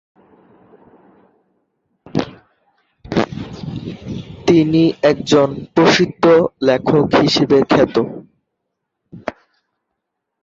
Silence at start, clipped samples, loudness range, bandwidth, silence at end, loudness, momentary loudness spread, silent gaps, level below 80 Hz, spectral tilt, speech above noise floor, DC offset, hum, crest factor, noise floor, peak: 2.15 s; under 0.1%; 13 LU; 7.8 kHz; 1.1 s; -15 LUFS; 17 LU; none; -48 dBFS; -6 dB/octave; 63 dB; under 0.1%; none; 16 dB; -76 dBFS; -2 dBFS